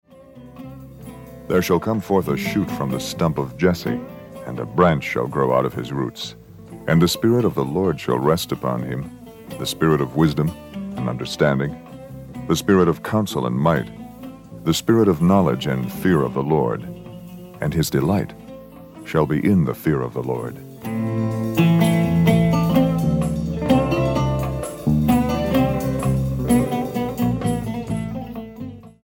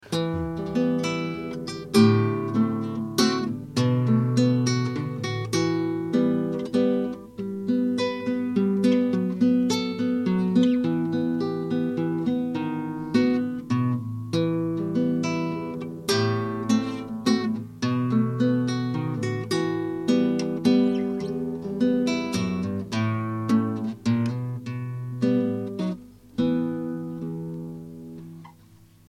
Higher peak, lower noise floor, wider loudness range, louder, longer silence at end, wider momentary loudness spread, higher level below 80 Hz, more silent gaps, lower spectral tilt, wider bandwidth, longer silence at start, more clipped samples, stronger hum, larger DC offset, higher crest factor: first, -2 dBFS vs -6 dBFS; second, -43 dBFS vs -53 dBFS; about the same, 4 LU vs 4 LU; first, -20 LUFS vs -25 LUFS; second, 0.15 s vs 0.6 s; first, 19 LU vs 10 LU; first, -40 dBFS vs -58 dBFS; neither; about the same, -6.5 dB/octave vs -6.5 dB/octave; first, 17 kHz vs 13 kHz; first, 0.2 s vs 0.05 s; neither; neither; neither; about the same, 18 dB vs 18 dB